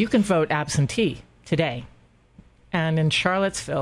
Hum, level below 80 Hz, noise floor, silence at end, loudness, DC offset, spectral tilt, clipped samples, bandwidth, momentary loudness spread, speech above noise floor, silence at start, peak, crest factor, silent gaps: none; -50 dBFS; -53 dBFS; 0 s; -23 LUFS; under 0.1%; -5 dB/octave; under 0.1%; 12 kHz; 7 LU; 31 dB; 0 s; -4 dBFS; 20 dB; none